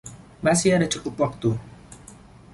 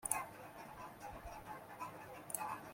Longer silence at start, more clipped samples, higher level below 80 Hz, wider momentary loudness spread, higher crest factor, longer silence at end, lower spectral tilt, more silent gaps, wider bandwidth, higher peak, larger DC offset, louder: about the same, 0.05 s vs 0 s; neither; first, -50 dBFS vs -66 dBFS; first, 25 LU vs 11 LU; second, 18 dB vs 32 dB; first, 0.4 s vs 0 s; first, -5 dB/octave vs -2.5 dB/octave; neither; second, 11.5 kHz vs 16.5 kHz; first, -6 dBFS vs -16 dBFS; neither; first, -23 LUFS vs -47 LUFS